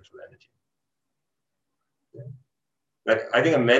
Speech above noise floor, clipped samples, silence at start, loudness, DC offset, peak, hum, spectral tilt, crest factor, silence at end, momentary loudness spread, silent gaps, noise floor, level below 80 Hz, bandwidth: 62 dB; under 0.1%; 0.2 s; -23 LUFS; under 0.1%; -6 dBFS; none; -5.5 dB/octave; 20 dB; 0 s; 24 LU; none; -85 dBFS; -72 dBFS; 8 kHz